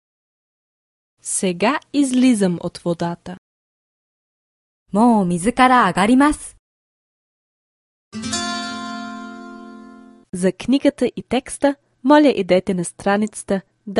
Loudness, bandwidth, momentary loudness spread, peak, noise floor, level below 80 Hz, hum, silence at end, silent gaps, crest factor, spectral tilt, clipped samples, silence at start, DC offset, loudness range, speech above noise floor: -18 LUFS; 11.5 kHz; 19 LU; 0 dBFS; -42 dBFS; -50 dBFS; none; 0 s; 3.38-4.86 s, 6.59-8.11 s; 20 dB; -5 dB/octave; under 0.1%; 1.25 s; under 0.1%; 11 LU; 26 dB